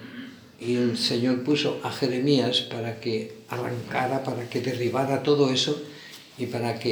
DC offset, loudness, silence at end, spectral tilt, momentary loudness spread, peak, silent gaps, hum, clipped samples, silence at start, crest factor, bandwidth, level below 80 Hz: under 0.1%; -26 LUFS; 0 s; -5 dB/octave; 14 LU; -8 dBFS; none; none; under 0.1%; 0 s; 18 dB; over 20 kHz; -70 dBFS